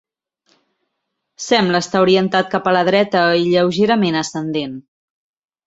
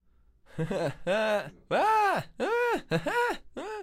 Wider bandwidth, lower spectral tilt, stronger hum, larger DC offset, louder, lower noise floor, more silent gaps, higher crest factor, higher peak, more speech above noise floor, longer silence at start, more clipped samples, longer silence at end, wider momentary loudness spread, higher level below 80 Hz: second, 8 kHz vs 15.5 kHz; about the same, -5 dB/octave vs -5 dB/octave; neither; neither; first, -16 LUFS vs -29 LUFS; first, -75 dBFS vs -61 dBFS; neither; about the same, 16 dB vs 14 dB; first, -2 dBFS vs -14 dBFS; first, 60 dB vs 33 dB; first, 1.4 s vs 0.55 s; neither; first, 0.85 s vs 0 s; about the same, 9 LU vs 11 LU; about the same, -60 dBFS vs -56 dBFS